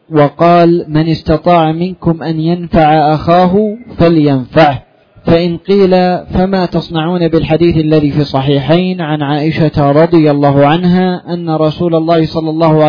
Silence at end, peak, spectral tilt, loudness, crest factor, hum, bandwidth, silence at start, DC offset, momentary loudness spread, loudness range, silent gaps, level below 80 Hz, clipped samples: 0 s; 0 dBFS; -9.5 dB/octave; -10 LUFS; 10 dB; none; 5.4 kHz; 0.1 s; under 0.1%; 7 LU; 1 LU; none; -34 dBFS; 0.3%